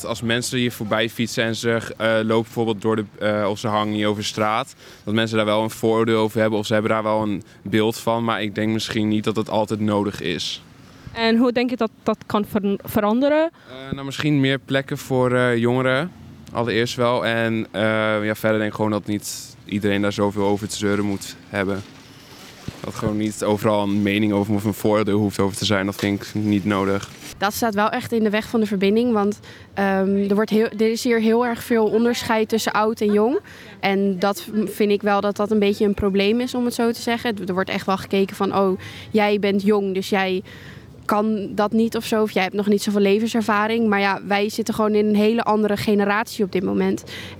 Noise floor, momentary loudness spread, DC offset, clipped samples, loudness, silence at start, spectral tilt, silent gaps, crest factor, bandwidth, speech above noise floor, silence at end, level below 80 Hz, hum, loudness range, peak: -43 dBFS; 7 LU; under 0.1%; under 0.1%; -21 LUFS; 0 s; -5.5 dB/octave; none; 18 dB; 16.5 kHz; 22 dB; 0 s; -56 dBFS; none; 3 LU; -4 dBFS